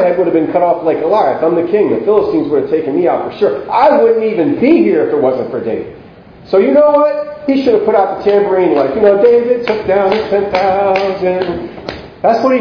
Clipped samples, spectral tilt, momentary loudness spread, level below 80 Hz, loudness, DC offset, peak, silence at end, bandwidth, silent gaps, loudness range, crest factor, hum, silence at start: under 0.1%; -8 dB/octave; 8 LU; -46 dBFS; -12 LUFS; under 0.1%; 0 dBFS; 0 s; 5.4 kHz; none; 2 LU; 12 dB; none; 0 s